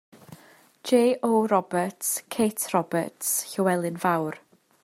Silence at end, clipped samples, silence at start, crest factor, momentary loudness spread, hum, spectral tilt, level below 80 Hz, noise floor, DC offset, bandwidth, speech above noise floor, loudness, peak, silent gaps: 0.45 s; under 0.1%; 0.3 s; 18 dB; 7 LU; none; -4.5 dB/octave; -74 dBFS; -54 dBFS; under 0.1%; 16 kHz; 30 dB; -25 LUFS; -8 dBFS; none